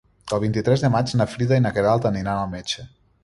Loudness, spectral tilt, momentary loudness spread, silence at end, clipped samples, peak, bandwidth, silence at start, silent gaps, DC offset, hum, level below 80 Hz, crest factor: -22 LUFS; -6.5 dB/octave; 9 LU; 0.35 s; under 0.1%; -6 dBFS; 11.5 kHz; 0.25 s; none; under 0.1%; none; -48 dBFS; 16 dB